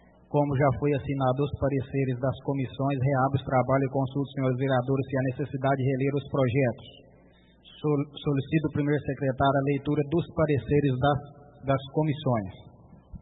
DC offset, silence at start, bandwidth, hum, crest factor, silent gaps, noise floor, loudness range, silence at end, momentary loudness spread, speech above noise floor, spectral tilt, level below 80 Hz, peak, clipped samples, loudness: under 0.1%; 0.3 s; 4 kHz; none; 18 dB; none; -57 dBFS; 2 LU; 0.05 s; 5 LU; 31 dB; -12 dB/octave; -54 dBFS; -10 dBFS; under 0.1%; -27 LUFS